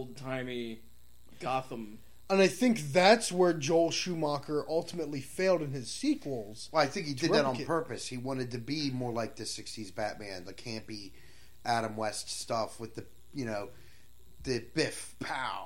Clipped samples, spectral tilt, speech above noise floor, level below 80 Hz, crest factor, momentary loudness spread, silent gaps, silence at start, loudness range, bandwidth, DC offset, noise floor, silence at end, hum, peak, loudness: under 0.1%; -4.5 dB/octave; 28 dB; -62 dBFS; 22 dB; 16 LU; none; 0 s; 9 LU; 16.5 kHz; 0.4%; -60 dBFS; 0 s; none; -10 dBFS; -32 LUFS